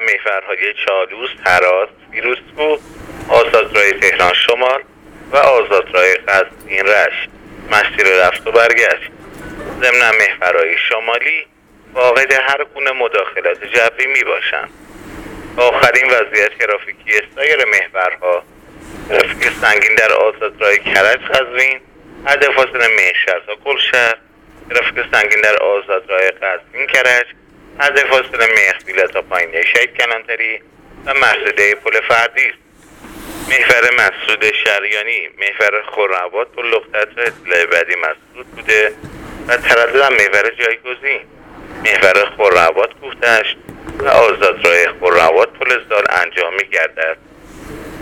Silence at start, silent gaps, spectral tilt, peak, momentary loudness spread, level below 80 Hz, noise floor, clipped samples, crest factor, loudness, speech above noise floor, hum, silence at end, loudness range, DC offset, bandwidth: 0 s; none; -2 dB/octave; 0 dBFS; 10 LU; -46 dBFS; -38 dBFS; under 0.1%; 14 dB; -12 LUFS; 25 dB; none; 0 s; 3 LU; under 0.1%; over 20 kHz